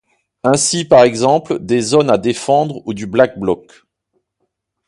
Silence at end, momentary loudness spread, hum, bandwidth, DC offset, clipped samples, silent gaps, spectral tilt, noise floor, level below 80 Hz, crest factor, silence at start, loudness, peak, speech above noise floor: 1.3 s; 10 LU; none; 11.5 kHz; under 0.1%; under 0.1%; none; -4.5 dB/octave; -71 dBFS; -52 dBFS; 16 dB; 0.45 s; -14 LUFS; 0 dBFS; 57 dB